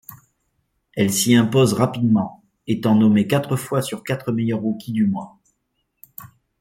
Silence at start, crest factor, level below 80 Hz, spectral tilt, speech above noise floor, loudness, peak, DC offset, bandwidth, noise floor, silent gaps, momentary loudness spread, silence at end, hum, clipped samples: 0.1 s; 18 dB; -60 dBFS; -5.5 dB/octave; 54 dB; -19 LUFS; -4 dBFS; under 0.1%; 16.5 kHz; -73 dBFS; none; 18 LU; 0.35 s; none; under 0.1%